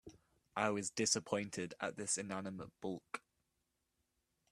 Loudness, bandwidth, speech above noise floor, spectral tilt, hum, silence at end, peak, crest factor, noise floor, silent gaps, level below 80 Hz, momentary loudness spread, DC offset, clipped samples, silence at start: -40 LUFS; 13.5 kHz; 45 dB; -3 dB/octave; none; 1.35 s; -20 dBFS; 24 dB; -85 dBFS; none; -78 dBFS; 12 LU; under 0.1%; under 0.1%; 0.05 s